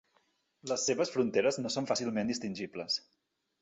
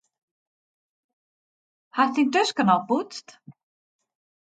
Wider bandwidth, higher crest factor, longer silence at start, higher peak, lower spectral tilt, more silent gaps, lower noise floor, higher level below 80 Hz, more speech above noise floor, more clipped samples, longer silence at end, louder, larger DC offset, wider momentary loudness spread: about the same, 8.4 kHz vs 9.2 kHz; about the same, 18 dB vs 20 dB; second, 0.65 s vs 1.95 s; second, -16 dBFS vs -6 dBFS; about the same, -3.5 dB/octave vs -4.5 dB/octave; neither; second, -74 dBFS vs under -90 dBFS; first, -74 dBFS vs -80 dBFS; second, 41 dB vs over 67 dB; neither; second, 0.65 s vs 0.95 s; second, -33 LUFS vs -23 LUFS; neither; second, 8 LU vs 14 LU